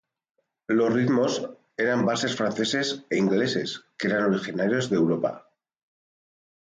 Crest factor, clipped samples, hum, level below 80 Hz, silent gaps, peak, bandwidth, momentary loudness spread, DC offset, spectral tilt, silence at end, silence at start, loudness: 14 dB; under 0.1%; none; -68 dBFS; none; -12 dBFS; 9.4 kHz; 8 LU; under 0.1%; -5 dB/octave; 1.3 s; 0.7 s; -25 LUFS